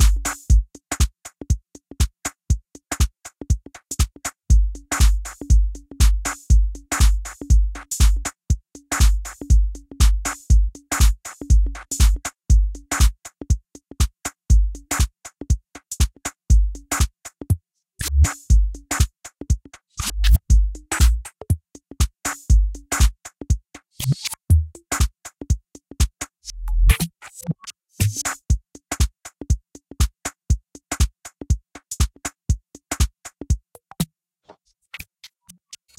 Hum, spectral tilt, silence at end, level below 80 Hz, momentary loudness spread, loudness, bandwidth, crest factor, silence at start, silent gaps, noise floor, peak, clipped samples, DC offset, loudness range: none; -4 dB/octave; 0.95 s; -22 dBFS; 12 LU; -23 LUFS; 16 kHz; 20 dB; 0 s; none; -53 dBFS; 0 dBFS; under 0.1%; under 0.1%; 5 LU